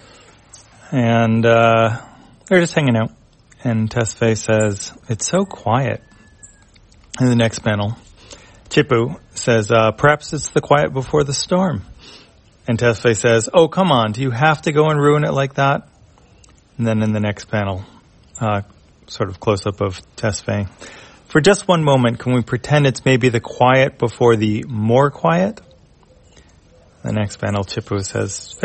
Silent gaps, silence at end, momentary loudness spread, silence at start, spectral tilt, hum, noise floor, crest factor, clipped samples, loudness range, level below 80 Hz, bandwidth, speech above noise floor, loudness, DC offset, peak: none; 0 s; 10 LU; 0.9 s; -5.5 dB/octave; none; -49 dBFS; 18 dB; under 0.1%; 7 LU; -48 dBFS; 8.8 kHz; 33 dB; -17 LUFS; under 0.1%; 0 dBFS